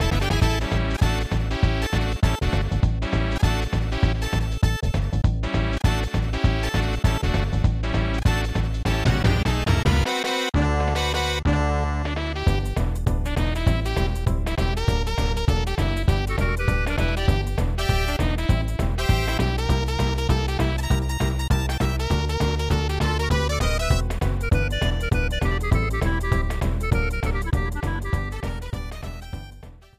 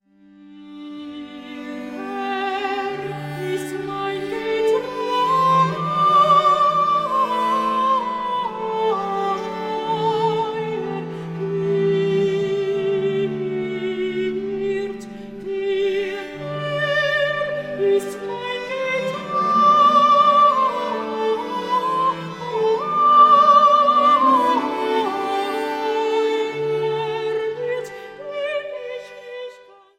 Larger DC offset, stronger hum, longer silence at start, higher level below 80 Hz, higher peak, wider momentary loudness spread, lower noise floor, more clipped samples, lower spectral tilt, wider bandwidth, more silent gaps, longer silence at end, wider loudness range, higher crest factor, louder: neither; neither; second, 0 s vs 0.4 s; first, -26 dBFS vs -60 dBFS; about the same, -6 dBFS vs -4 dBFS; second, 4 LU vs 16 LU; second, -43 dBFS vs -48 dBFS; neither; about the same, -5.5 dB/octave vs -5.5 dB/octave; about the same, 15.5 kHz vs 15 kHz; neither; second, 0.25 s vs 0.45 s; second, 2 LU vs 10 LU; about the same, 14 dB vs 16 dB; second, -23 LUFS vs -19 LUFS